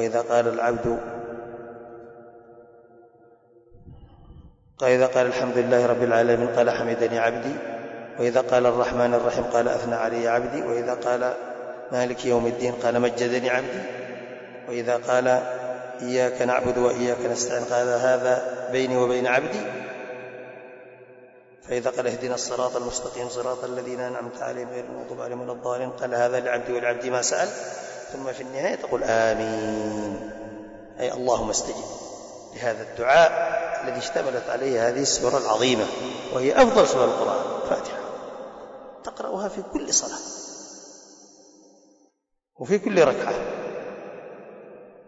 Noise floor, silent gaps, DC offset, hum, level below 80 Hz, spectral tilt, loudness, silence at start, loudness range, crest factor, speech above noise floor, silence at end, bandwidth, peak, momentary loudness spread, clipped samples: -71 dBFS; none; under 0.1%; none; -56 dBFS; -3.5 dB/octave; -24 LUFS; 0 s; 8 LU; 18 dB; 48 dB; 0.05 s; 8 kHz; -6 dBFS; 17 LU; under 0.1%